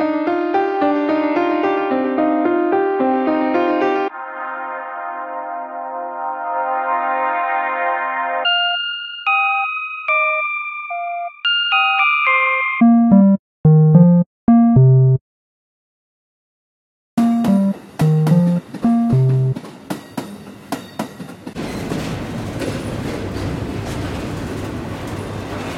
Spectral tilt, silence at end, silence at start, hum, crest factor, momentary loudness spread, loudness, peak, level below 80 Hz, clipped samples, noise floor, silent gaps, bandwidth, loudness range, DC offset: -7 dB/octave; 0 s; 0 s; none; 16 dB; 15 LU; -17 LUFS; -2 dBFS; -44 dBFS; under 0.1%; under -90 dBFS; 13.39-13.64 s, 14.26-14.47 s, 15.21-17.17 s; 13.5 kHz; 12 LU; under 0.1%